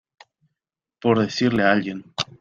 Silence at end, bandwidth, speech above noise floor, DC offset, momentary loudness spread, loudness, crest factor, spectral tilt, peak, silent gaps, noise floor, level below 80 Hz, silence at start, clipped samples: 0.15 s; 7.6 kHz; 63 dB; under 0.1%; 10 LU; -21 LUFS; 20 dB; -5.5 dB/octave; -4 dBFS; none; -84 dBFS; -58 dBFS; 1.05 s; under 0.1%